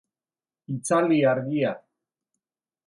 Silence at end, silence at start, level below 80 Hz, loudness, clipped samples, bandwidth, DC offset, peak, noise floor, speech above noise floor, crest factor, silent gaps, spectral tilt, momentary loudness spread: 1.1 s; 0.7 s; -74 dBFS; -24 LUFS; under 0.1%; 11.5 kHz; under 0.1%; -10 dBFS; under -90 dBFS; over 67 dB; 16 dB; none; -6 dB/octave; 14 LU